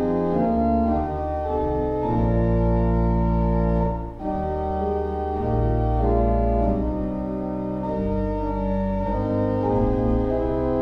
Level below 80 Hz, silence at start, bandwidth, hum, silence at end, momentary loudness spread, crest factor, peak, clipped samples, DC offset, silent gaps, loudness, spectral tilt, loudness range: -28 dBFS; 0 s; 5.2 kHz; none; 0 s; 6 LU; 14 dB; -8 dBFS; under 0.1%; under 0.1%; none; -23 LUFS; -11 dB/octave; 2 LU